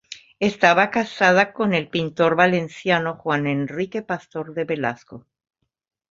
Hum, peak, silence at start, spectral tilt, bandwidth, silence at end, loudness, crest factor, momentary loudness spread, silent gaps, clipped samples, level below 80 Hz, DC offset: none; -2 dBFS; 0.1 s; -5.5 dB/octave; 7.8 kHz; 0.95 s; -20 LUFS; 20 dB; 12 LU; none; under 0.1%; -62 dBFS; under 0.1%